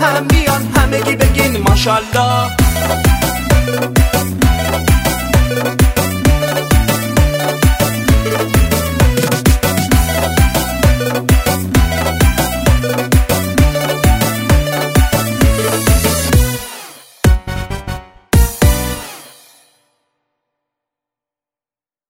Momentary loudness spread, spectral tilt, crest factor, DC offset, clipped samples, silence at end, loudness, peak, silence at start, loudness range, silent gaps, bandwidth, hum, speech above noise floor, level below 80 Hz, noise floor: 3 LU; -5 dB/octave; 12 dB; under 0.1%; under 0.1%; 2.8 s; -13 LUFS; 0 dBFS; 0 s; 5 LU; none; 16.5 kHz; none; over 77 dB; -18 dBFS; under -90 dBFS